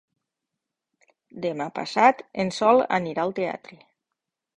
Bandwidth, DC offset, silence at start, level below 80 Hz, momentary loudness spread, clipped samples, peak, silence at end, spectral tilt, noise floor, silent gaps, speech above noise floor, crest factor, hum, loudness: 10.5 kHz; under 0.1%; 1.35 s; -68 dBFS; 11 LU; under 0.1%; -4 dBFS; 0.8 s; -5.5 dB/octave; -85 dBFS; none; 61 dB; 22 dB; none; -23 LUFS